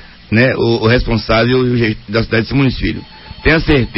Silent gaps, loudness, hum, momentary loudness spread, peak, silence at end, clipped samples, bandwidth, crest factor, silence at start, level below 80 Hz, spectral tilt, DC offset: none; -13 LUFS; none; 7 LU; 0 dBFS; 0 s; under 0.1%; 5.8 kHz; 14 dB; 0 s; -26 dBFS; -9.5 dB/octave; 0.3%